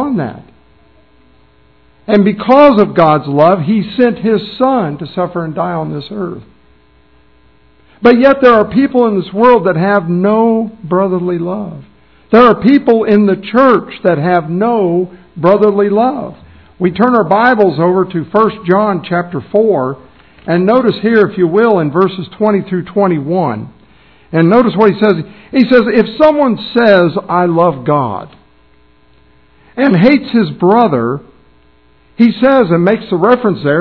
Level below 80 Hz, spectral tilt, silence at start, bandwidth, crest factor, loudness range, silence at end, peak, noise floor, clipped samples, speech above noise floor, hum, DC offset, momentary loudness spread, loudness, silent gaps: -46 dBFS; -9.5 dB/octave; 0 s; 5.4 kHz; 12 dB; 4 LU; 0 s; 0 dBFS; -49 dBFS; 1%; 39 dB; none; 0.3%; 10 LU; -11 LUFS; none